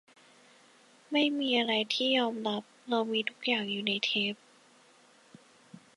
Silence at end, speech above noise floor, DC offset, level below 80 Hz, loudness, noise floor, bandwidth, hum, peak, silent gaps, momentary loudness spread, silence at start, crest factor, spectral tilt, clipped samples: 0.2 s; 31 dB; under 0.1%; -84 dBFS; -30 LUFS; -61 dBFS; 11.5 kHz; none; -12 dBFS; none; 7 LU; 1.1 s; 20 dB; -4 dB/octave; under 0.1%